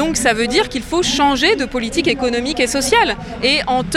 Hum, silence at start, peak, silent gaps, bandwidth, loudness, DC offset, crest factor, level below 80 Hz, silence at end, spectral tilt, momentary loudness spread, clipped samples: none; 0 s; -2 dBFS; none; 16.5 kHz; -16 LUFS; under 0.1%; 14 dB; -36 dBFS; 0 s; -3 dB/octave; 5 LU; under 0.1%